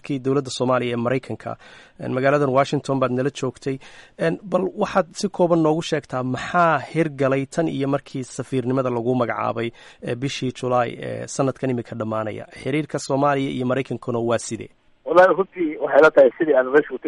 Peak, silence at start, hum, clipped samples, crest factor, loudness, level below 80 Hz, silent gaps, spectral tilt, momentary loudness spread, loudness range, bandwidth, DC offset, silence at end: -4 dBFS; 0.05 s; none; under 0.1%; 18 dB; -21 LUFS; -58 dBFS; none; -6 dB/octave; 14 LU; 6 LU; 11.5 kHz; under 0.1%; 0 s